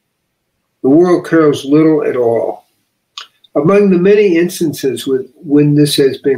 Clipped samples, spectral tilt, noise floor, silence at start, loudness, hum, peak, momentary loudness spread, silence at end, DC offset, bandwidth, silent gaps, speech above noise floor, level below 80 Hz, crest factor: under 0.1%; -6.5 dB/octave; -68 dBFS; 0.85 s; -11 LUFS; none; 0 dBFS; 11 LU; 0 s; under 0.1%; 16 kHz; none; 57 dB; -58 dBFS; 10 dB